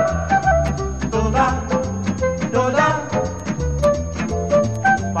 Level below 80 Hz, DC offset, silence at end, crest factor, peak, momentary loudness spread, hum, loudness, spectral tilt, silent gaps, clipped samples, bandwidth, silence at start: -30 dBFS; 0.7%; 0 s; 14 dB; -4 dBFS; 7 LU; none; -19 LUFS; -6 dB/octave; none; under 0.1%; 9.6 kHz; 0 s